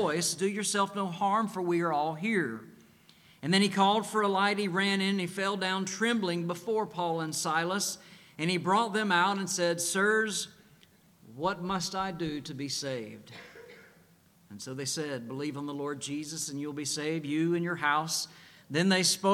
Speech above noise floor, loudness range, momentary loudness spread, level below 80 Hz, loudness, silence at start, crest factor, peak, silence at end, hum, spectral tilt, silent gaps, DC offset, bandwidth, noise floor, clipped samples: 32 dB; 9 LU; 10 LU; -70 dBFS; -30 LUFS; 0 s; 20 dB; -10 dBFS; 0 s; none; -3.5 dB/octave; none; under 0.1%; 16 kHz; -62 dBFS; under 0.1%